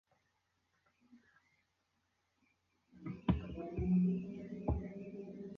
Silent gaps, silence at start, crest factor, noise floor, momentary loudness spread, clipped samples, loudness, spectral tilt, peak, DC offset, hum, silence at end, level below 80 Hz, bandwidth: none; 1.1 s; 22 dB; -82 dBFS; 15 LU; under 0.1%; -39 LUFS; -9.5 dB/octave; -18 dBFS; under 0.1%; none; 0 s; -52 dBFS; 4 kHz